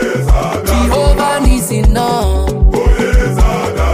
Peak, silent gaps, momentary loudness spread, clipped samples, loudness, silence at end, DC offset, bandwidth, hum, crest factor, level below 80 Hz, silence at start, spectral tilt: 0 dBFS; none; 2 LU; under 0.1%; -13 LUFS; 0 s; under 0.1%; 16 kHz; none; 10 dB; -12 dBFS; 0 s; -5.5 dB/octave